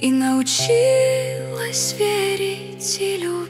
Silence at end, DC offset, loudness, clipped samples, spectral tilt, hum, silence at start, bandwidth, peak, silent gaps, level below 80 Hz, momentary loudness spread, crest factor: 0 s; under 0.1%; -19 LUFS; under 0.1%; -3.5 dB/octave; none; 0 s; 16 kHz; -6 dBFS; none; -64 dBFS; 10 LU; 14 dB